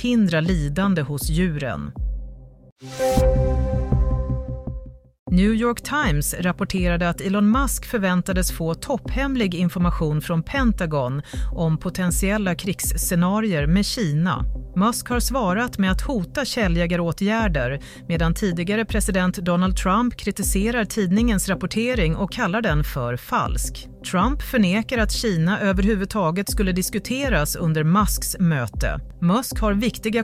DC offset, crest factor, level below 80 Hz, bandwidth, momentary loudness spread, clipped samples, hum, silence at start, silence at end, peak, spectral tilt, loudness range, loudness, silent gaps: under 0.1%; 14 dB; -30 dBFS; 16 kHz; 7 LU; under 0.1%; none; 0 s; 0 s; -6 dBFS; -5.5 dB/octave; 2 LU; -22 LUFS; 2.72-2.76 s, 5.19-5.26 s